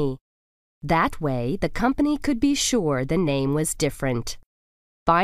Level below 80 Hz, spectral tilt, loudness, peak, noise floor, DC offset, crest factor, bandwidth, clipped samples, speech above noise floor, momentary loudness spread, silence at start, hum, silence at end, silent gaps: -40 dBFS; -5 dB/octave; -23 LUFS; -6 dBFS; under -90 dBFS; under 0.1%; 18 dB; 15.5 kHz; under 0.1%; over 67 dB; 8 LU; 0 s; none; 0 s; 0.21-0.81 s, 4.46-5.06 s